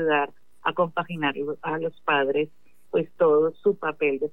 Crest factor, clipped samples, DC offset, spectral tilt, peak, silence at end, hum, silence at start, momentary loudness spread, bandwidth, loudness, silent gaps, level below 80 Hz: 16 dB; under 0.1%; 0.5%; -7.5 dB/octave; -10 dBFS; 0.05 s; none; 0 s; 8 LU; 3.9 kHz; -25 LUFS; none; -76 dBFS